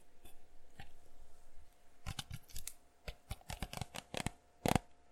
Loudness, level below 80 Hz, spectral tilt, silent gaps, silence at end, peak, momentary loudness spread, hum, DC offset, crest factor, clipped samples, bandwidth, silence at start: -44 LUFS; -54 dBFS; -4.5 dB/octave; none; 0 s; -12 dBFS; 24 LU; none; under 0.1%; 32 dB; under 0.1%; 16 kHz; 0 s